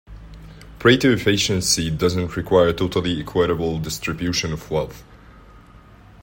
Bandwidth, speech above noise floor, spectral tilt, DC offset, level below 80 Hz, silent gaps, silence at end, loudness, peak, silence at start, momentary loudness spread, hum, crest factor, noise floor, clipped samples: 16.5 kHz; 26 dB; -4.5 dB/octave; under 0.1%; -42 dBFS; none; 0.65 s; -20 LUFS; -2 dBFS; 0.1 s; 9 LU; none; 20 dB; -46 dBFS; under 0.1%